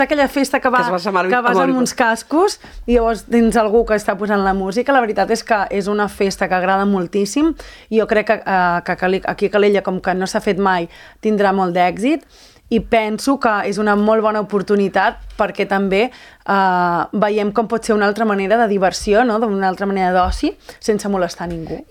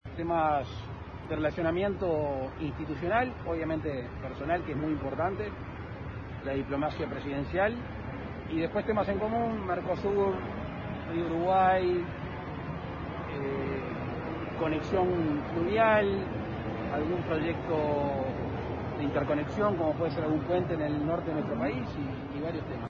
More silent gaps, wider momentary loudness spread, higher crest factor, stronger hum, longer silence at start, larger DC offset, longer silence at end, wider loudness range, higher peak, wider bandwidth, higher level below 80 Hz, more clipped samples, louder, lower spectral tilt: neither; second, 5 LU vs 10 LU; about the same, 16 dB vs 18 dB; neither; about the same, 0 s vs 0.05 s; neither; about the same, 0.05 s vs 0 s; about the same, 2 LU vs 4 LU; first, 0 dBFS vs -14 dBFS; first, 17.5 kHz vs 7.2 kHz; first, -38 dBFS vs -48 dBFS; neither; first, -17 LUFS vs -31 LUFS; second, -5 dB/octave vs -8.5 dB/octave